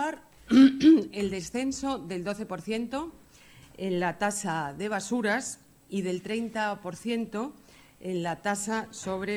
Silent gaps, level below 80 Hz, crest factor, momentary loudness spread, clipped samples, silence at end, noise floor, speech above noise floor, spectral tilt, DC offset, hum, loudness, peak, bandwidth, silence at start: none; -60 dBFS; 20 dB; 16 LU; under 0.1%; 0 s; -54 dBFS; 26 dB; -4.5 dB/octave; under 0.1%; none; -28 LUFS; -8 dBFS; 14 kHz; 0 s